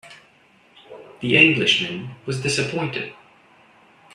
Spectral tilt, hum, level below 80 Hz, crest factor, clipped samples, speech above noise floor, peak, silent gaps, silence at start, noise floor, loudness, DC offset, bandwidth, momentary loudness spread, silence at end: -4 dB/octave; none; -60 dBFS; 24 dB; under 0.1%; 35 dB; 0 dBFS; none; 0.05 s; -55 dBFS; -19 LUFS; under 0.1%; 12.5 kHz; 16 LU; 1 s